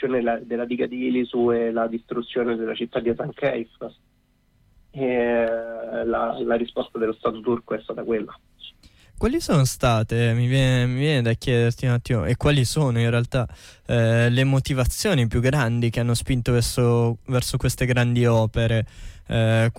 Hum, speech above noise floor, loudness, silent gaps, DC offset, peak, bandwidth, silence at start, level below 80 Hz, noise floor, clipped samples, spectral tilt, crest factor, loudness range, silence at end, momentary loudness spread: none; 40 dB; -22 LUFS; none; under 0.1%; -10 dBFS; 16 kHz; 0 s; -40 dBFS; -62 dBFS; under 0.1%; -6 dB/octave; 12 dB; 6 LU; 0.05 s; 8 LU